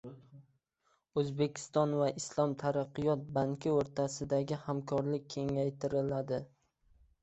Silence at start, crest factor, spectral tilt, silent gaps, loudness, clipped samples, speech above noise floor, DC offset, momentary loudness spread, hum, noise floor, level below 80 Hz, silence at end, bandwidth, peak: 0.05 s; 18 dB; -6.5 dB/octave; none; -35 LUFS; under 0.1%; 43 dB; under 0.1%; 5 LU; none; -77 dBFS; -66 dBFS; 0.75 s; 8.2 kHz; -16 dBFS